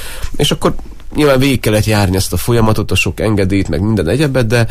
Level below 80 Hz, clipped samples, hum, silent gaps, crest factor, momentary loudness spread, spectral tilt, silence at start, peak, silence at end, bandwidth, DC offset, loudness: -26 dBFS; under 0.1%; none; none; 12 dB; 5 LU; -5.5 dB/octave; 0 s; 0 dBFS; 0 s; 15.5 kHz; under 0.1%; -13 LUFS